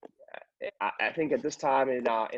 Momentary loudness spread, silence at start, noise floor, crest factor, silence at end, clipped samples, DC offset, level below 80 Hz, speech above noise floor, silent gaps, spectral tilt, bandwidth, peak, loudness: 21 LU; 0.2 s; -50 dBFS; 16 dB; 0 s; under 0.1%; under 0.1%; -74 dBFS; 21 dB; none; -4 dB/octave; 8 kHz; -14 dBFS; -29 LUFS